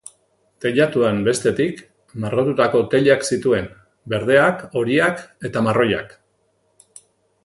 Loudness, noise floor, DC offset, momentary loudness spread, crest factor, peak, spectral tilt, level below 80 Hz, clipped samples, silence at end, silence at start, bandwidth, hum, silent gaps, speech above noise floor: -19 LUFS; -65 dBFS; under 0.1%; 11 LU; 20 dB; 0 dBFS; -5.5 dB/octave; -54 dBFS; under 0.1%; 1.35 s; 0.6 s; 11.5 kHz; none; none; 47 dB